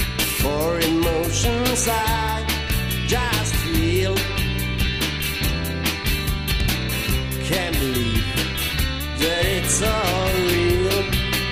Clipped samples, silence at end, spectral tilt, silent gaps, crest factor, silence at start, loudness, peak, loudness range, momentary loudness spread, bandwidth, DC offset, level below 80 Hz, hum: under 0.1%; 0 s; -4 dB/octave; none; 14 dB; 0 s; -21 LUFS; -6 dBFS; 2 LU; 4 LU; 15.5 kHz; under 0.1%; -28 dBFS; none